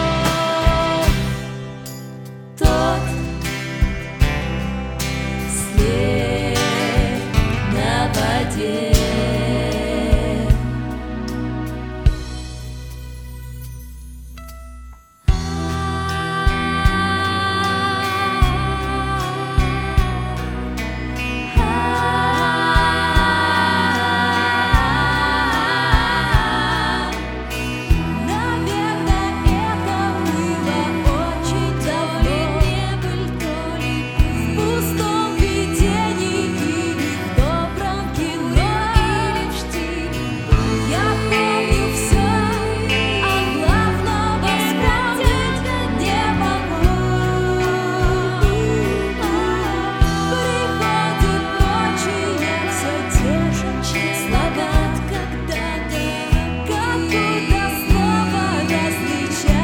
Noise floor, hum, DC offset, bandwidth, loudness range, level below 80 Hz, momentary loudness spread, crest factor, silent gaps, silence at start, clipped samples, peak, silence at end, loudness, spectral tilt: -40 dBFS; none; under 0.1%; 18 kHz; 5 LU; -24 dBFS; 8 LU; 18 dB; none; 0 s; under 0.1%; 0 dBFS; 0 s; -19 LUFS; -5 dB/octave